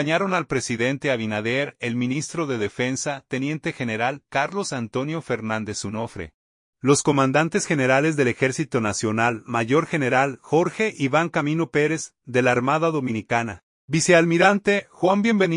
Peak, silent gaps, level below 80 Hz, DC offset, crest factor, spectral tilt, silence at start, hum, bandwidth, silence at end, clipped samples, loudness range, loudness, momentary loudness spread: -2 dBFS; 6.34-6.73 s, 13.63-13.88 s; -60 dBFS; under 0.1%; 20 dB; -5 dB/octave; 0 s; none; 11 kHz; 0 s; under 0.1%; 5 LU; -22 LUFS; 9 LU